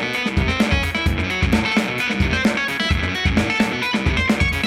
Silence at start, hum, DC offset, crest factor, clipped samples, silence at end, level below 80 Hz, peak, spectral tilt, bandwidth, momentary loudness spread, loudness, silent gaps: 0 s; none; under 0.1%; 14 dB; under 0.1%; 0 s; -28 dBFS; -6 dBFS; -5 dB/octave; 16 kHz; 2 LU; -19 LUFS; none